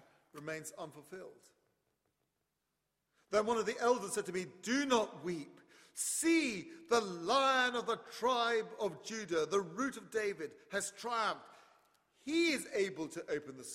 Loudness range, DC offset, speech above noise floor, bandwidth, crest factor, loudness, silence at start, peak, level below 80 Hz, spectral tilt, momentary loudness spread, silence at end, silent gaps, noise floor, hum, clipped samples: 5 LU; under 0.1%; 49 dB; 16 kHz; 20 dB; -36 LUFS; 0.35 s; -16 dBFS; -78 dBFS; -3 dB/octave; 16 LU; 0 s; none; -85 dBFS; none; under 0.1%